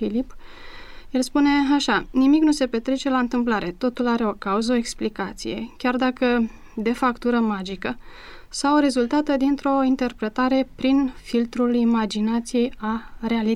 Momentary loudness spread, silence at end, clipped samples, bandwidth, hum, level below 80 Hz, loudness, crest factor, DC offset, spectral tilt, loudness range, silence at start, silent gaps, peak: 10 LU; 0 s; under 0.1%; 12.5 kHz; none; -44 dBFS; -22 LUFS; 14 dB; under 0.1%; -4.5 dB/octave; 3 LU; 0 s; none; -8 dBFS